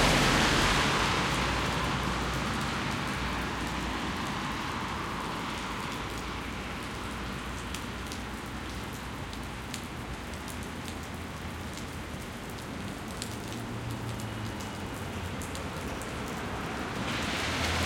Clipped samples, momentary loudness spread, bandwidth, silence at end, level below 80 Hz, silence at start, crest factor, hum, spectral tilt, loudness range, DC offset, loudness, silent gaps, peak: under 0.1%; 12 LU; 17 kHz; 0 s; -44 dBFS; 0 s; 22 dB; none; -4 dB/octave; 9 LU; under 0.1%; -33 LUFS; none; -12 dBFS